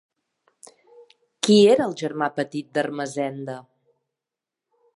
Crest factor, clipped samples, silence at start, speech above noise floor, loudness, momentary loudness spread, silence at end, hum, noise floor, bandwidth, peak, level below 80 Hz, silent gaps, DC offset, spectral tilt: 20 dB; under 0.1%; 1.45 s; 67 dB; -21 LUFS; 17 LU; 1.35 s; none; -88 dBFS; 11.5 kHz; -4 dBFS; -74 dBFS; none; under 0.1%; -5 dB/octave